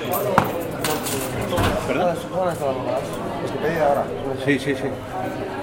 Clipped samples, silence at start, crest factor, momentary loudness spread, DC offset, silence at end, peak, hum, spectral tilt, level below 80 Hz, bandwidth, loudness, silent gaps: under 0.1%; 0 s; 22 dB; 7 LU; under 0.1%; 0 s; 0 dBFS; none; -5 dB/octave; -42 dBFS; 16.5 kHz; -23 LUFS; none